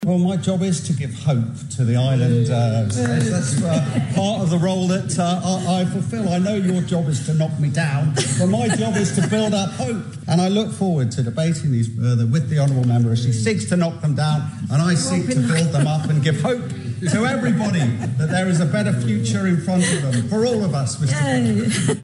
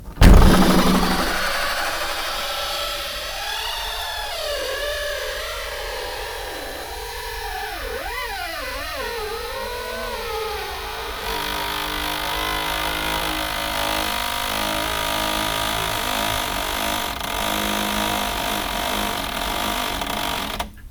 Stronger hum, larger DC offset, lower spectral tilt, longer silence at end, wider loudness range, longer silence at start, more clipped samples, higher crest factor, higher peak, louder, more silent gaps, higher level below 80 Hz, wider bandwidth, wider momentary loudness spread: neither; neither; first, -6 dB/octave vs -3.5 dB/octave; about the same, 0 s vs 0 s; second, 1 LU vs 6 LU; about the same, 0 s vs 0 s; neither; second, 14 dB vs 22 dB; second, -6 dBFS vs 0 dBFS; first, -19 LUFS vs -23 LUFS; neither; second, -58 dBFS vs -28 dBFS; second, 11.5 kHz vs over 20 kHz; second, 4 LU vs 7 LU